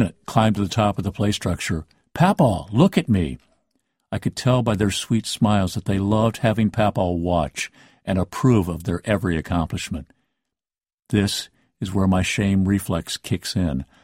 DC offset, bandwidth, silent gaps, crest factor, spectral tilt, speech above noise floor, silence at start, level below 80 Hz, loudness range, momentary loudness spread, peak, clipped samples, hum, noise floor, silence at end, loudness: under 0.1%; 16 kHz; 10.94-10.98 s; 18 dB; -6 dB/octave; over 69 dB; 0 s; -42 dBFS; 3 LU; 10 LU; -4 dBFS; under 0.1%; none; under -90 dBFS; 0.2 s; -22 LUFS